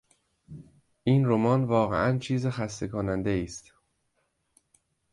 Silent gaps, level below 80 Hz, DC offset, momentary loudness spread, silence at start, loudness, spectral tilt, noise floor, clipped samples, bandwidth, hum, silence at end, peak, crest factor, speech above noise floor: none; -54 dBFS; under 0.1%; 20 LU; 0.5 s; -27 LUFS; -7 dB/octave; -75 dBFS; under 0.1%; 11.5 kHz; none; 1.5 s; -10 dBFS; 20 dB; 49 dB